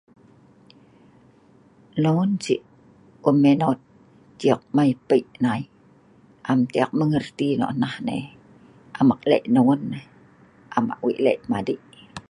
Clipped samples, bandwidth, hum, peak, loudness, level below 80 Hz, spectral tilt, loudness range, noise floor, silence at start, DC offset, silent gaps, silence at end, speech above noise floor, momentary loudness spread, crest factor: under 0.1%; 10.5 kHz; none; -2 dBFS; -22 LUFS; -62 dBFS; -7.5 dB/octave; 3 LU; -54 dBFS; 1.95 s; under 0.1%; none; 0.1 s; 34 dB; 14 LU; 20 dB